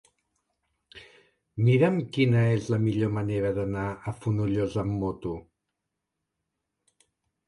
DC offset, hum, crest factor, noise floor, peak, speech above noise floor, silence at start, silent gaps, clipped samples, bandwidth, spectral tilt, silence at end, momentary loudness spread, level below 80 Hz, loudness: under 0.1%; none; 20 dB; -84 dBFS; -8 dBFS; 58 dB; 0.95 s; none; under 0.1%; 11 kHz; -8 dB/octave; 2.1 s; 11 LU; -52 dBFS; -26 LUFS